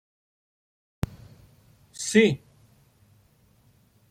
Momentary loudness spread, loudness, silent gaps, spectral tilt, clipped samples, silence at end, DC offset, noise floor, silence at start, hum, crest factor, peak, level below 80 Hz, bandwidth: 16 LU; -25 LUFS; none; -4.5 dB/octave; under 0.1%; 1.75 s; under 0.1%; -61 dBFS; 1.1 s; none; 26 dB; -4 dBFS; -54 dBFS; 16 kHz